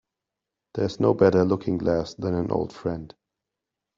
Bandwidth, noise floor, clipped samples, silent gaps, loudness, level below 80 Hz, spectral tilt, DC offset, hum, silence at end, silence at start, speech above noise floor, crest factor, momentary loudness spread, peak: 7.4 kHz; -86 dBFS; under 0.1%; none; -24 LUFS; -54 dBFS; -8 dB/octave; under 0.1%; none; 0.9 s; 0.75 s; 63 dB; 20 dB; 12 LU; -4 dBFS